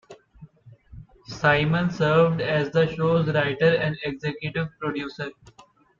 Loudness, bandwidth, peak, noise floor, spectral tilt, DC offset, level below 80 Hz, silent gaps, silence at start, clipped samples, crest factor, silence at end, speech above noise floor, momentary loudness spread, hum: -23 LUFS; 7.2 kHz; -6 dBFS; -50 dBFS; -7 dB/octave; under 0.1%; -52 dBFS; none; 0.1 s; under 0.1%; 18 dB; 0.65 s; 27 dB; 11 LU; none